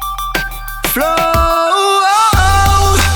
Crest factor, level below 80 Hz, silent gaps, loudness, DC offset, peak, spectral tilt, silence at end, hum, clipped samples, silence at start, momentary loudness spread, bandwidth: 10 dB; -20 dBFS; none; -12 LUFS; under 0.1%; -2 dBFS; -3.5 dB/octave; 0 s; none; under 0.1%; 0 s; 9 LU; 19.5 kHz